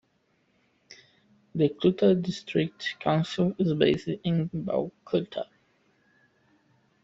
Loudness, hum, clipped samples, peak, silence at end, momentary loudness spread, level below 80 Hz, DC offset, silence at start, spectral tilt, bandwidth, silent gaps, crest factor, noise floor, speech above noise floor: -27 LUFS; none; under 0.1%; -8 dBFS; 1.6 s; 8 LU; -64 dBFS; under 0.1%; 0.9 s; -7 dB/octave; 7.8 kHz; none; 20 dB; -70 dBFS; 44 dB